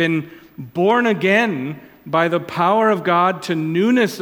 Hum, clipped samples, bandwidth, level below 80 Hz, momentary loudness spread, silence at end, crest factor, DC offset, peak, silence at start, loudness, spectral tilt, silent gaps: none; under 0.1%; 18 kHz; -64 dBFS; 14 LU; 0 s; 16 dB; under 0.1%; -2 dBFS; 0 s; -17 LUFS; -6 dB/octave; none